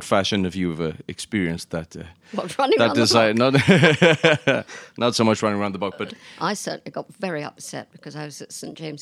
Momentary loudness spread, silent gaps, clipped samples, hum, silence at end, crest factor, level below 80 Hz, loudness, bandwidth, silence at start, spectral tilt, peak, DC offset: 19 LU; none; under 0.1%; none; 0 s; 22 dB; -56 dBFS; -20 LUFS; 14.5 kHz; 0 s; -5 dB/octave; 0 dBFS; under 0.1%